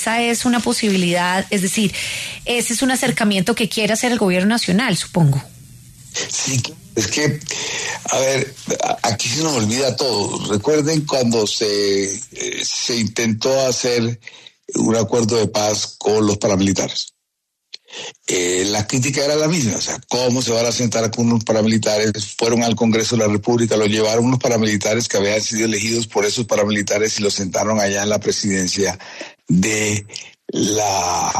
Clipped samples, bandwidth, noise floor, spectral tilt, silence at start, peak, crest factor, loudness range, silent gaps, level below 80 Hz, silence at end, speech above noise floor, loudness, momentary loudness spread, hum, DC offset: under 0.1%; 13.5 kHz; -75 dBFS; -4 dB/octave; 0 s; -4 dBFS; 14 dB; 3 LU; none; -52 dBFS; 0 s; 57 dB; -18 LUFS; 6 LU; none; under 0.1%